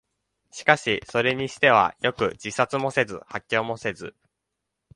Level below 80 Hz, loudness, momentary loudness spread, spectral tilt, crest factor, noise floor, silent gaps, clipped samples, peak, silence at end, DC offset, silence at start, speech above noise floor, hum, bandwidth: -60 dBFS; -23 LUFS; 14 LU; -4 dB/octave; 24 dB; -82 dBFS; none; under 0.1%; -2 dBFS; 0.85 s; under 0.1%; 0.55 s; 58 dB; none; 11.5 kHz